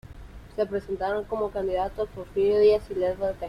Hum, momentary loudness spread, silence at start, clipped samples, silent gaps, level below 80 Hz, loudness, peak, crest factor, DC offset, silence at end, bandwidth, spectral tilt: none; 10 LU; 0.05 s; under 0.1%; none; -46 dBFS; -26 LUFS; -10 dBFS; 16 dB; under 0.1%; 0 s; 10 kHz; -7 dB/octave